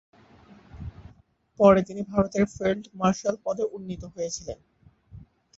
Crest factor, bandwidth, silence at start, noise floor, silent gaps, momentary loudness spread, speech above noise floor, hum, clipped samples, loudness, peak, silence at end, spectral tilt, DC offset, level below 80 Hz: 24 dB; 8 kHz; 0.75 s; -58 dBFS; none; 23 LU; 34 dB; none; under 0.1%; -25 LUFS; -4 dBFS; 0.35 s; -6 dB/octave; under 0.1%; -52 dBFS